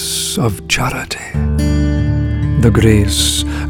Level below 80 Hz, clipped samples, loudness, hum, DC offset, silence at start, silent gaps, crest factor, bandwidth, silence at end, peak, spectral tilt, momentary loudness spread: -22 dBFS; under 0.1%; -14 LUFS; none; under 0.1%; 0 s; none; 14 dB; 17.5 kHz; 0 s; 0 dBFS; -4.5 dB/octave; 8 LU